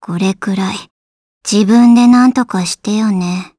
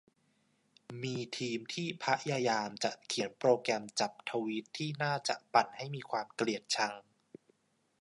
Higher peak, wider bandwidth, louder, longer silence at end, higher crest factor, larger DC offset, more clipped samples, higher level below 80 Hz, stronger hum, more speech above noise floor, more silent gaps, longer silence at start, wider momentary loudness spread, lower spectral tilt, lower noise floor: first, 0 dBFS vs -12 dBFS; about the same, 11 kHz vs 11.5 kHz; first, -12 LUFS vs -35 LUFS; second, 0.1 s vs 1 s; second, 12 dB vs 24 dB; neither; neither; first, -56 dBFS vs -84 dBFS; neither; first, over 79 dB vs 41 dB; first, 0.91-1.41 s vs none; second, 0 s vs 0.9 s; first, 12 LU vs 9 LU; about the same, -5 dB/octave vs -4 dB/octave; first, under -90 dBFS vs -75 dBFS